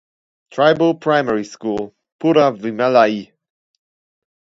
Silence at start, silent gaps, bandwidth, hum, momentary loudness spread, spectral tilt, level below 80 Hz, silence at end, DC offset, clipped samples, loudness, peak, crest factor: 0.55 s; 2.12-2.19 s; 7.8 kHz; none; 12 LU; -6 dB/octave; -62 dBFS; 1.3 s; under 0.1%; under 0.1%; -17 LUFS; 0 dBFS; 18 dB